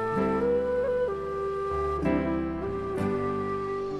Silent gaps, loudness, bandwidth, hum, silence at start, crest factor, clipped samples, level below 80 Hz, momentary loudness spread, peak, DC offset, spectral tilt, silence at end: none; -28 LUFS; 12 kHz; none; 0 s; 14 dB; under 0.1%; -44 dBFS; 5 LU; -14 dBFS; under 0.1%; -8.5 dB/octave; 0 s